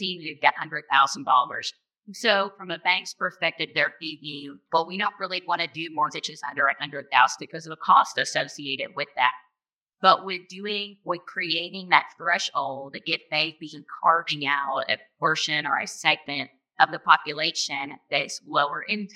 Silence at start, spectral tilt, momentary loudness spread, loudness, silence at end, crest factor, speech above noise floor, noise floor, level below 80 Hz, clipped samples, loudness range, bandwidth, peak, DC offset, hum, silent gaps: 0 s; -2 dB/octave; 12 LU; -24 LUFS; 0.1 s; 24 dB; 62 dB; -87 dBFS; -86 dBFS; under 0.1%; 3 LU; 13.5 kHz; 0 dBFS; under 0.1%; none; 9.73-9.79 s